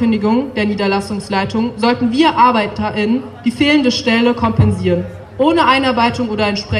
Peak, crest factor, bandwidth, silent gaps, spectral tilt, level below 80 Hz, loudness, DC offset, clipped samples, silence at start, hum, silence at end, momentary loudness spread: 0 dBFS; 14 dB; 11.5 kHz; none; -6 dB/octave; -40 dBFS; -14 LUFS; under 0.1%; under 0.1%; 0 s; none; 0 s; 7 LU